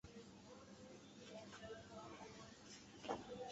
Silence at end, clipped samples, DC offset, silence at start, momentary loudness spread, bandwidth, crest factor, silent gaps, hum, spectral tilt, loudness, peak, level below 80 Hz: 0 s; under 0.1%; under 0.1%; 0.05 s; 10 LU; 8 kHz; 26 dB; none; none; -3.5 dB/octave; -56 LUFS; -30 dBFS; -76 dBFS